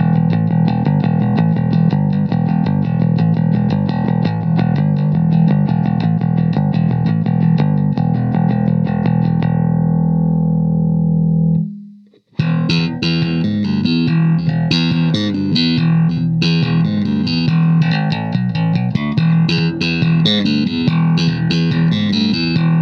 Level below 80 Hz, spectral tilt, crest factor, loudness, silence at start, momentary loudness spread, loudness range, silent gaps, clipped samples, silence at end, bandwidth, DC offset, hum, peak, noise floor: -44 dBFS; -8 dB/octave; 14 dB; -15 LUFS; 0 s; 3 LU; 1 LU; none; under 0.1%; 0 s; 6.4 kHz; under 0.1%; none; 0 dBFS; -44 dBFS